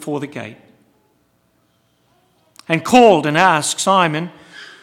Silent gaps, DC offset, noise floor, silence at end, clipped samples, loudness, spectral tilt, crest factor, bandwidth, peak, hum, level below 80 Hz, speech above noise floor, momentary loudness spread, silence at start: none; under 0.1%; -61 dBFS; 0.2 s; under 0.1%; -14 LUFS; -4 dB/octave; 18 dB; 16.5 kHz; 0 dBFS; none; -60 dBFS; 46 dB; 23 LU; 0 s